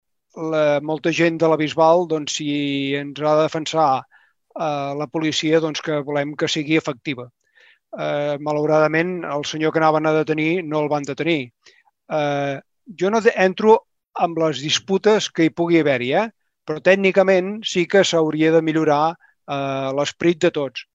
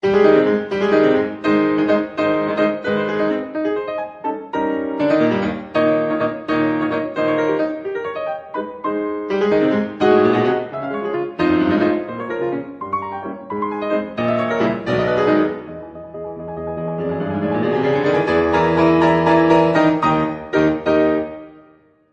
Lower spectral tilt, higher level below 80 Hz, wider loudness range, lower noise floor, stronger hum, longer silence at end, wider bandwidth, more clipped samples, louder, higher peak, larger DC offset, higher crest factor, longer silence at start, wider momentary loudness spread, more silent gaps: second, -5 dB/octave vs -7.5 dB/octave; second, -66 dBFS vs -50 dBFS; about the same, 4 LU vs 5 LU; first, -55 dBFS vs -51 dBFS; neither; second, 0.1 s vs 0.6 s; about the same, 8 kHz vs 7.4 kHz; neither; about the same, -19 LUFS vs -18 LUFS; about the same, 0 dBFS vs -2 dBFS; neither; about the same, 18 dB vs 16 dB; first, 0.35 s vs 0 s; about the same, 10 LU vs 12 LU; neither